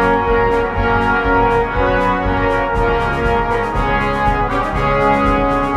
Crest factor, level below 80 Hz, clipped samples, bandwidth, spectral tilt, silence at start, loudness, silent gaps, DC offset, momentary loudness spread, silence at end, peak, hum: 12 dB; -24 dBFS; under 0.1%; 11.5 kHz; -7 dB/octave; 0 s; -15 LUFS; none; under 0.1%; 3 LU; 0 s; -2 dBFS; none